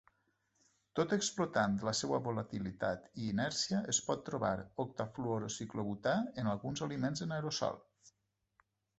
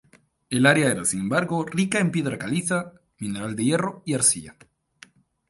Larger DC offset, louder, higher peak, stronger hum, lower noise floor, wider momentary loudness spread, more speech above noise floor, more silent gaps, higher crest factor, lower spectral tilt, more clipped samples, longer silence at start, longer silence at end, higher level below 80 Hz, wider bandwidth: neither; second, -37 LUFS vs -23 LUFS; second, -18 dBFS vs -2 dBFS; neither; first, -83 dBFS vs -53 dBFS; second, 7 LU vs 11 LU; first, 46 dB vs 30 dB; neither; about the same, 20 dB vs 22 dB; about the same, -4.5 dB/octave vs -4 dB/octave; neither; first, 0.95 s vs 0.5 s; about the same, 0.9 s vs 1 s; second, -66 dBFS vs -60 dBFS; second, 8.2 kHz vs 12 kHz